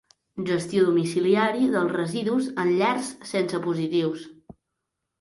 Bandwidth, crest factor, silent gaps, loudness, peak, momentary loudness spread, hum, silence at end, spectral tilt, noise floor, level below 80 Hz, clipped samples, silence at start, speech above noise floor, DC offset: 11.5 kHz; 16 dB; none; -24 LUFS; -8 dBFS; 8 LU; none; 0.7 s; -6 dB/octave; -82 dBFS; -66 dBFS; under 0.1%; 0.35 s; 58 dB; under 0.1%